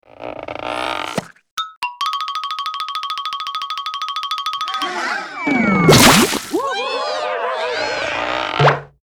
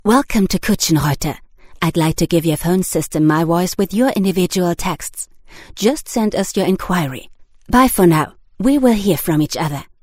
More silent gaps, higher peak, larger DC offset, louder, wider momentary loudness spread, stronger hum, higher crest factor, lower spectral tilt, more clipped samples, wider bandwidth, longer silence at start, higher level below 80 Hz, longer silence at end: first, 1.51-1.57 s, 1.77-1.82 s vs none; about the same, 0 dBFS vs 0 dBFS; neither; about the same, -18 LUFS vs -16 LUFS; first, 14 LU vs 11 LU; neither; about the same, 18 dB vs 16 dB; second, -3.5 dB/octave vs -5.5 dB/octave; neither; first, over 20 kHz vs 16.5 kHz; first, 0.2 s vs 0.05 s; second, -44 dBFS vs -36 dBFS; about the same, 0.15 s vs 0.15 s